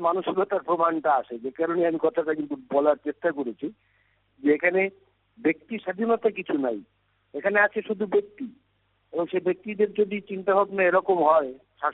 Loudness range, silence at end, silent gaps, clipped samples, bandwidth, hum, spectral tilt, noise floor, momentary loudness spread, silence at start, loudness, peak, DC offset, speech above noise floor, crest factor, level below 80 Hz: 3 LU; 0 s; none; under 0.1%; 4.1 kHz; 50 Hz at -75 dBFS; -4.5 dB/octave; -69 dBFS; 11 LU; 0 s; -25 LUFS; -8 dBFS; under 0.1%; 45 dB; 18 dB; -72 dBFS